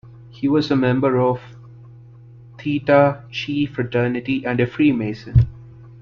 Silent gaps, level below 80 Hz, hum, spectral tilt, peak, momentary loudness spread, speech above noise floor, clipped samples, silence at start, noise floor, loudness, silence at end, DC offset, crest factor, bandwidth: none; -38 dBFS; none; -8.5 dB/octave; -2 dBFS; 9 LU; 25 dB; under 0.1%; 0.05 s; -43 dBFS; -19 LUFS; 0.05 s; under 0.1%; 18 dB; 6.6 kHz